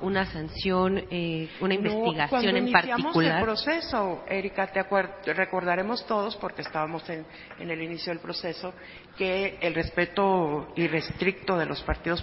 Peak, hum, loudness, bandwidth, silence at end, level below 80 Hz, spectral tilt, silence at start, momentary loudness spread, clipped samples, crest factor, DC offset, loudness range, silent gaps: -2 dBFS; none; -27 LUFS; 5.8 kHz; 0 s; -48 dBFS; -9.5 dB/octave; 0 s; 10 LU; under 0.1%; 26 dB; under 0.1%; 7 LU; none